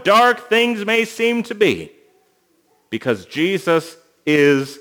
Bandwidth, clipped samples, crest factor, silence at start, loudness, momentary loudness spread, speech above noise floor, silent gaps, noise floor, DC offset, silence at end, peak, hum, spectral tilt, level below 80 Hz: over 20 kHz; under 0.1%; 16 dB; 0 s; -17 LUFS; 12 LU; 44 dB; none; -61 dBFS; under 0.1%; 0.05 s; -2 dBFS; none; -4.5 dB/octave; -64 dBFS